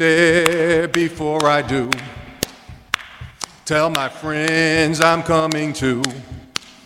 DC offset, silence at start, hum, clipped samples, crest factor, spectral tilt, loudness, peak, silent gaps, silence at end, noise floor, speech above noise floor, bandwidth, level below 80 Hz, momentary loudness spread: under 0.1%; 0 s; none; under 0.1%; 18 dB; -4 dB/octave; -18 LUFS; 0 dBFS; none; 0.25 s; -40 dBFS; 23 dB; 16.5 kHz; -46 dBFS; 14 LU